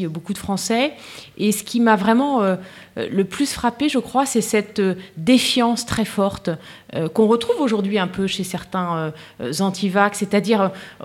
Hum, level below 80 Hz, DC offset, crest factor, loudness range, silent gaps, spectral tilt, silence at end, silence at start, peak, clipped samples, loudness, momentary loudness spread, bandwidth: none; -52 dBFS; under 0.1%; 18 dB; 2 LU; none; -4.5 dB/octave; 0 s; 0 s; -2 dBFS; under 0.1%; -20 LUFS; 11 LU; 16.5 kHz